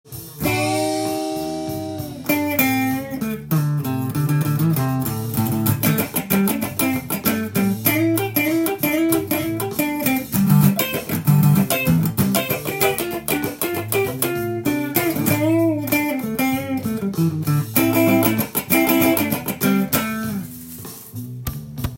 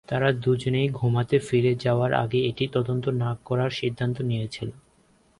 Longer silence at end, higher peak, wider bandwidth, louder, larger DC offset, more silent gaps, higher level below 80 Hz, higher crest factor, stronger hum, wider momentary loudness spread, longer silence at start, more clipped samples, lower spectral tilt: second, 0 s vs 0.65 s; first, 0 dBFS vs -6 dBFS; first, 17 kHz vs 11 kHz; first, -20 LUFS vs -25 LUFS; neither; neither; first, -48 dBFS vs -56 dBFS; about the same, 20 dB vs 18 dB; neither; first, 10 LU vs 6 LU; about the same, 0.05 s vs 0.1 s; neither; second, -5.5 dB/octave vs -7.5 dB/octave